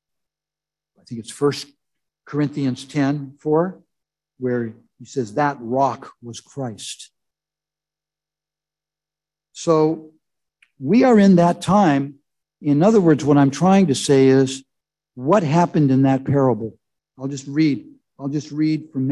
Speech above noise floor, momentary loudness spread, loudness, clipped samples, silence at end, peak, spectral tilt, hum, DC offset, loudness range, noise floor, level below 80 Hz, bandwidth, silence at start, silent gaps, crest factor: 72 dB; 18 LU; -18 LUFS; under 0.1%; 0 s; -2 dBFS; -7 dB/octave; 50 Hz at -40 dBFS; under 0.1%; 10 LU; -90 dBFS; -58 dBFS; 12 kHz; 1.1 s; none; 18 dB